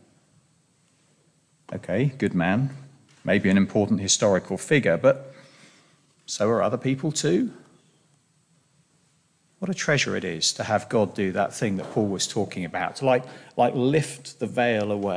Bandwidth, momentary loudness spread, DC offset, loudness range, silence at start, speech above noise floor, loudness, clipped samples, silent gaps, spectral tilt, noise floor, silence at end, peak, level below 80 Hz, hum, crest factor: 10.5 kHz; 11 LU; under 0.1%; 6 LU; 1.7 s; 41 dB; -24 LUFS; under 0.1%; none; -4.5 dB/octave; -65 dBFS; 0 s; -6 dBFS; -64 dBFS; none; 20 dB